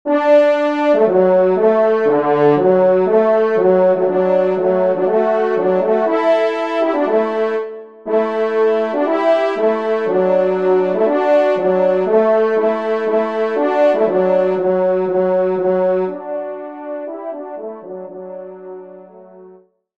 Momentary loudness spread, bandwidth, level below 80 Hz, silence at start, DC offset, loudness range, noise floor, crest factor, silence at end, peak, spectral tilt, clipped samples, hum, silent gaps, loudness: 15 LU; 7 kHz; -66 dBFS; 0.05 s; 0.3%; 7 LU; -46 dBFS; 14 dB; 0.45 s; -2 dBFS; -8 dB/octave; under 0.1%; none; none; -15 LUFS